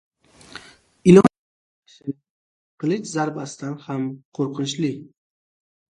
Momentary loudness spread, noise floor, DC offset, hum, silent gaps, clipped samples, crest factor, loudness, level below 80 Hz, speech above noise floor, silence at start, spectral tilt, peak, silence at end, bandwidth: 25 LU; -44 dBFS; under 0.1%; none; 1.39-1.82 s, 2.30-2.78 s, 4.25-4.32 s; under 0.1%; 22 dB; -21 LUFS; -60 dBFS; 18 dB; 0.55 s; -6.5 dB/octave; 0 dBFS; 0.9 s; 11.5 kHz